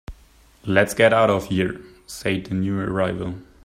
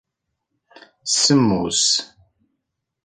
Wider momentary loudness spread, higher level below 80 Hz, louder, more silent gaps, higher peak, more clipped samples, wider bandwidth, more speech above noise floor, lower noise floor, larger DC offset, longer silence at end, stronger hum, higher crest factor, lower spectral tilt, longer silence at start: first, 16 LU vs 6 LU; first, -48 dBFS vs -54 dBFS; second, -21 LUFS vs -17 LUFS; neither; about the same, -2 dBFS vs -4 dBFS; neither; first, 16 kHz vs 10 kHz; second, 32 dB vs 60 dB; second, -52 dBFS vs -78 dBFS; neither; second, 0.2 s vs 1 s; neither; about the same, 20 dB vs 18 dB; first, -5.5 dB/octave vs -3 dB/octave; second, 0.1 s vs 1.05 s